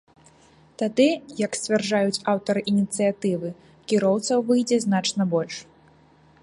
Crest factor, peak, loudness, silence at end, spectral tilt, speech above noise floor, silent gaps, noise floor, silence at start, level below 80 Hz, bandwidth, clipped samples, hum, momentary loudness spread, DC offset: 16 dB; -8 dBFS; -23 LUFS; 0.8 s; -5 dB/octave; 33 dB; none; -55 dBFS; 0.8 s; -66 dBFS; 11.5 kHz; under 0.1%; none; 8 LU; under 0.1%